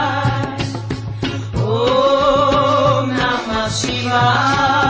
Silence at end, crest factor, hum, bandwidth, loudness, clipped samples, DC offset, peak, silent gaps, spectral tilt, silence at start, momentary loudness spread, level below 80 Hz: 0 s; 14 dB; none; 8 kHz; -16 LUFS; under 0.1%; under 0.1%; -2 dBFS; none; -5 dB/octave; 0 s; 10 LU; -36 dBFS